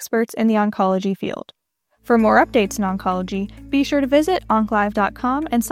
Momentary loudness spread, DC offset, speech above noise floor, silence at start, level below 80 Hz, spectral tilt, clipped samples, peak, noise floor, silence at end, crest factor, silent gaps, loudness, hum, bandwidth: 9 LU; under 0.1%; 42 dB; 0 s; -44 dBFS; -5.5 dB/octave; under 0.1%; -2 dBFS; -60 dBFS; 0 s; 18 dB; none; -19 LUFS; none; 16 kHz